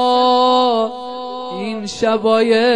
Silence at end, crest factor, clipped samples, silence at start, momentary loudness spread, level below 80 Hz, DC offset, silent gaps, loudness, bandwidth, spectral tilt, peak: 0 s; 12 dB; under 0.1%; 0 s; 14 LU; -56 dBFS; 0.5%; none; -16 LUFS; 10 kHz; -4 dB/octave; -4 dBFS